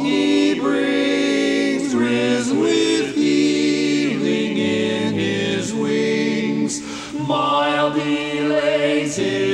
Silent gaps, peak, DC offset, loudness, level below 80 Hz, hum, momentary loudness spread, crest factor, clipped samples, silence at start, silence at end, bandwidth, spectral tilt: none; -6 dBFS; under 0.1%; -19 LUFS; -56 dBFS; none; 4 LU; 12 dB; under 0.1%; 0 s; 0 s; 11 kHz; -4.5 dB/octave